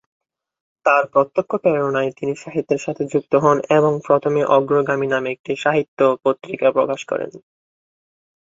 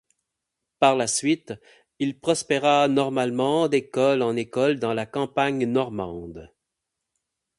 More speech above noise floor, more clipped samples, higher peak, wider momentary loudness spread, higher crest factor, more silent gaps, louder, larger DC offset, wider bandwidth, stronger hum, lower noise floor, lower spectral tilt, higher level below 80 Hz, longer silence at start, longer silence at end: first, over 72 dB vs 60 dB; neither; about the same, 0 dBFS vs -2 dBFS; second, 8 LU vs 11 LU; about the same, 18 dB vs 22 dB; first, 5.39-5.44 s, 5.88-5.97 s vs none; first, -19 LUFS vs -23 LUFS; neither; second, 7.8 kHz vs 11.5 kHz; neither; first, under -90 dBFS vs -83 dBFS; first, -6.5 dB/octave vs -4.5 dB/octave; about the same, -64 dBFS vs -60 dBFS; about the same, 0.85 s vs 0.8 s; about the same, 1.1 s vs 1.15 s